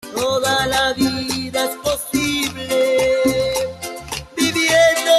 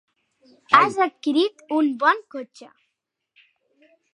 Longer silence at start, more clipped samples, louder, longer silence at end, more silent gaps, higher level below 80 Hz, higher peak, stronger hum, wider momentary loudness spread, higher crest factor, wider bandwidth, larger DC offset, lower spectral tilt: second, 0.05 s vs 0.7 s; neither; about the same, -18 LUFS vs -20 LUFS; second, 0 s vs 1.5 s; neither; first, -44 dBFS vs -78 dBFS; second, -4 dBFS vs 0 dBFS; neither; second, 10 LU vs 20 LU; second, 14 dB vs 24 dB; first, 13 kHz vs 11.5 kHz; neither; second, -3 dB/octave vs -4.5 dB/octave